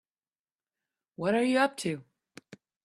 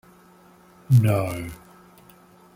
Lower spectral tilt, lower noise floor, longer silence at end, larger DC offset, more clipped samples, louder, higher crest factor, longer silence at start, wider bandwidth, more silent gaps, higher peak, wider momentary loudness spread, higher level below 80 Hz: second, -5 dB/octave vs -8 dB/octave; first, under -90 dBFS vs -53 dBFS; second, 0.3 s vs 1 s; neither; neither; second, -28 LUFS vs -22 LUFS; about the same, 22 dB vs 18 dB; first, 1.2 s vs 0.9 s; second, 13 kHz vs 16 kHz; neither; second, -12 dBFS vs -6 dBFS; second, 10 LU vs 20 LU; second, -76 dBFS vs -54 dBFS